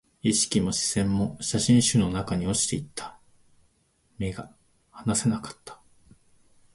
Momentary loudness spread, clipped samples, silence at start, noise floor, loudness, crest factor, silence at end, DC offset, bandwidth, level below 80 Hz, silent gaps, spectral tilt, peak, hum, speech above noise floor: 19 LU; under 0.1%; 0.25 s; -67 dBFS; -25 LUFS; 18 dB; 1 s; under 0.1%; 11.5 kHz; -50 dBFS; none; -4.5 dB/octave; -8 dBFS; none; 42 dB